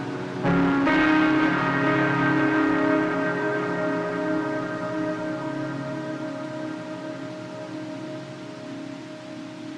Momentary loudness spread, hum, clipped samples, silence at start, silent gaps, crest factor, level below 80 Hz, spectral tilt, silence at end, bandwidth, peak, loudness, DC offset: 16 LU; none; under 0.1%; 0 s; none; 16 dB; -54 dBFS; -7 dB/octave; 0 s; 9.4 kHz; -10 dBFS; -24 LUFS; under 0.1%